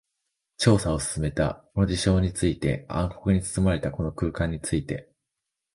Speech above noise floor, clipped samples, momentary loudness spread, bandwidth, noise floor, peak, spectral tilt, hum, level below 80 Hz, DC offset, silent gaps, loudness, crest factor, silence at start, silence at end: 60 dB; under 0.1%; 7 LU; 11.5 kHz; -84 dBFS; -6 dBFS; -5.5 dB/octave; none; -38 dBFS; under 0.1%; none; -26 LUFS; 20 dB; 0.6 s; 0.75 s